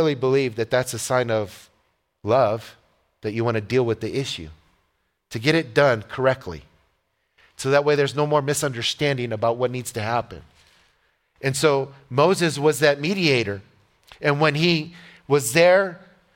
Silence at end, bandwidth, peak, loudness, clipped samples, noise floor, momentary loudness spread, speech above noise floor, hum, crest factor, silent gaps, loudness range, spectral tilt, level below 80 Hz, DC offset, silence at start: 0.4 s; 17 kHz; -2 dBFS; -21 LUFS; under 0.1%; -71 dBFS; 11 LU; 50 dB; none; 20 dB; none; 4 LU; -4.5 dB/octave; -56 dBFS; under 0.1%; 0 s